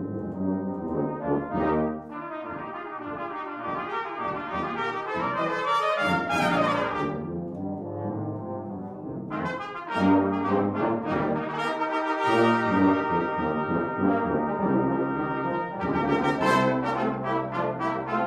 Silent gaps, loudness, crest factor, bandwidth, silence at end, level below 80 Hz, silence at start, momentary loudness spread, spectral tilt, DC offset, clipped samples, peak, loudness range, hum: none; -27 LUFS; 18 dB; 12.5 kHz; 0 s; -54 dBFS; 0 s; 12 LU; -7 dB/octave; under 0.1%; under 0.1%; -10 dBFS; 6 LU; none